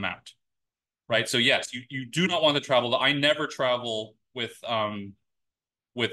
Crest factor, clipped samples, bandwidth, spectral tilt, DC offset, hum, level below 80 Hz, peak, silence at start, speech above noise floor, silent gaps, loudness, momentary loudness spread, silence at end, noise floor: 22 dB; under 0.1%; 12.5 kHz; -3.5 dB/octave; under 0.1%; none; -72 dBFS; -6 dBFS; 0 s; 62 dB; none; -25 LUFS; 15 LU; 0 s; -88 dBFS